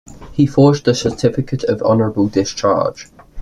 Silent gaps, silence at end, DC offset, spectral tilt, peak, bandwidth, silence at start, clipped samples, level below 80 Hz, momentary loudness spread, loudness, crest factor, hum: none; 0 s; under 0.1%; -6.5 dB/octave; -2 dBFS; 11 kHz; 0.1 s; under 0.1%; -44 dBFS; 8 LU; -16 LUFS; 14 dB; none